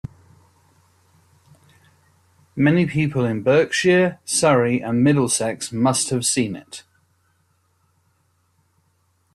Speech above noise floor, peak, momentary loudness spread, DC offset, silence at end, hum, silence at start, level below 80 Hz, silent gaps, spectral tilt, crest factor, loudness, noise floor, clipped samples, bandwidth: 46 dB; -4 dBFS; 13 LU; under 0.1%; 2.55 s; none; 2.55 s; -56 dBFS; none; -4.5 dB/octave; 18 dB; -19 LUFS; -65 dBFS; under 0.1%; 14 kHz